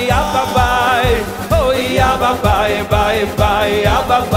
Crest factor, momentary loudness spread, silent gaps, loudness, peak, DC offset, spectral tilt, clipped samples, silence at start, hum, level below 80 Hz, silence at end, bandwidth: 12 dB; 2 LU; none; -14 LUFS; 0 dBFS; under 0.1%; -5 dB/octave; under 0.1%; 0 s; none; -24 dBFS; 0 s; 16 kHz